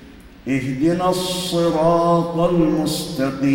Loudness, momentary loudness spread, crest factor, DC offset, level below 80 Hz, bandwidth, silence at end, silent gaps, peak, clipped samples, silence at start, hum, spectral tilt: -19 LUFS; 7 LU; 14 dB; under 0.1%; -44 dBFS; 16.5 kHz; 0 s; none; -4 dBFS; under 0.1%; 0 s; none; -6 dB/octave